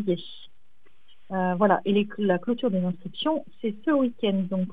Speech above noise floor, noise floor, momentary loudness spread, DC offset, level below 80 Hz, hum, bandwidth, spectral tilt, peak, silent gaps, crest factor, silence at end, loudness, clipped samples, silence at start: 41 dB; -66 dBFS; 9 LU; 0.9%; -70 dBFS; none; 4.8 kHz; -9.5 dB/octave; -6 dBFS; none; 20 dB; 0 s; -26 LUFS; under 0.1%; 0 s